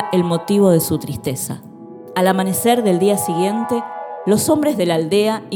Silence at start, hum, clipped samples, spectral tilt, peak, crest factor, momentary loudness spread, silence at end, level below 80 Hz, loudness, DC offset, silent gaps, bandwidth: 0 s; none; under 0.1%; -5.5 dB/octave; 0 dBFS; 16 dB; 11 LU; 0 s; -56 dBFS; -17 LUFS; under 0.1%; none; 19 kHz